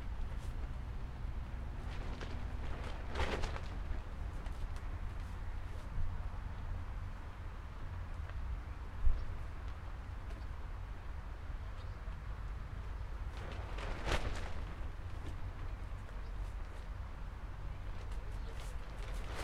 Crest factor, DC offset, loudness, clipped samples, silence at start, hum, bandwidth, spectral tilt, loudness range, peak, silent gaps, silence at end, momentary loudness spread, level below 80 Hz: 22 dB; under 0.1%; -45 LUFS; under 0.1%; 0 s; none; 11.5 kHz; -6 dB/octave; 4 LU; -18 dBFS; none; 0 s; 7 LU; -42 dBFS